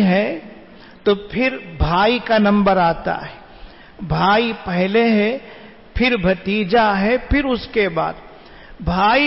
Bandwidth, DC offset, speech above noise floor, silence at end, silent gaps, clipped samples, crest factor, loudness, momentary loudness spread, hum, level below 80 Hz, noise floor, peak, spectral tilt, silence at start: 5.8 kHz; 0.3%; 25 dB; 0 s; none; under 0.1%; 12 dB; -18 LUFS; 11 LU; none; -34 dBFS; -42 dBFS; -6 dBFS; -10 dB/octave; 0 s